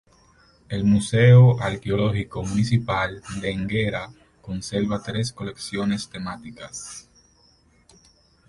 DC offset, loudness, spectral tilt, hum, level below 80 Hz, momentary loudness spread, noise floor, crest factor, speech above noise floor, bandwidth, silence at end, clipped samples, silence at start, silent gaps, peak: under 0.1%; -22 LUFS; -6.5 dB/octave; none; -46 dBFS; 20 LU; -58 dBFS; 18 dB; 37 dB; 11.5 kHz; 1.5 s; under 0.1%; 0.7 s; none; -4 dBFS